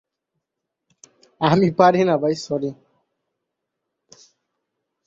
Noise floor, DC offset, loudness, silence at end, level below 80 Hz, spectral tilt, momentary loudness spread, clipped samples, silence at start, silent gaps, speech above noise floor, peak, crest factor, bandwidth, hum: -82 dBFS; under 0.1%; -19 LUFS; 2.35 s; -62 dBFS; -6.5 dB/octave; 11 LU; under 0.1%; 1.4 s; none; 64 dB; -2 dBFS; 20 dB; 7.8 kHz; none